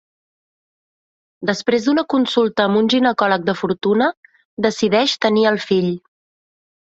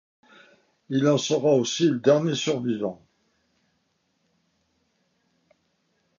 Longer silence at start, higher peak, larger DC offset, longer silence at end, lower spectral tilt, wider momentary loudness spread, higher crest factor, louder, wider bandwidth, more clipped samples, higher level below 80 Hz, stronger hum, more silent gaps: first, 1.4 s vs 0.9 s; first, -2 dBFS vs -6 dBFS; neither; second, 0.95 s vs 3.25 s; about the same, -5 dB/octave vs -5 dB/octave; about the same, 6 LU vs 8 LU; about the same, 16 dB vs 20 dB; first, -17 LUFS vs -23 LUFS; about the same, 8 kHz vs 7.4 kHz; neither; first, -60 dBFS vs -72 dBFS; neither; first, 4.17-4.23 s, 4.45-4.57 s vs none